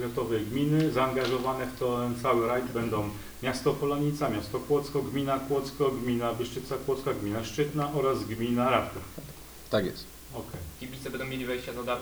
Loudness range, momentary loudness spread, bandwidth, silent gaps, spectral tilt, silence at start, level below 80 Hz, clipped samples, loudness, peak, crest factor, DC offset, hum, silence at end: 3 LU; 13 LU; over 20 kHz; none; -6 dB/octave; 0 s; -52 dBFS; under 0.1%; -30 LUFS; -10 dBFS; 20 dB; under 0.1%; none; 0 s